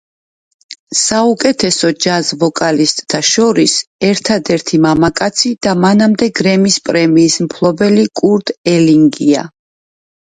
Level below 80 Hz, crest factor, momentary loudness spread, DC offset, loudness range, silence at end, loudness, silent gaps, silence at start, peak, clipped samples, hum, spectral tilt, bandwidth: -48 dBFS; 12 dB; 4 LU; under 0.1%; 1 LU; 0.85 s; -11 LUFS; 0.79-0.87 s, 3.87-3.99 s, 8.57-8.64 s; 0.7 s; 0 dBFS; under 0.1%; none; -4 dB/octave; 9.6 kHz